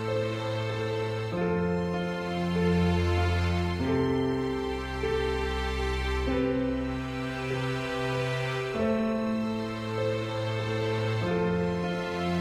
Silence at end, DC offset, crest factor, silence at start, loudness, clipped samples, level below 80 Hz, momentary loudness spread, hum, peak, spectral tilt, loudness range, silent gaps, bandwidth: 0 s; under 0.1%; 12 dB; 0 s; -29 LUFS; under 0.1%; -40 dBFS; 5 LU; none; -16 dBFS; -7 dB/octave; 2 LU; none; 13 kHz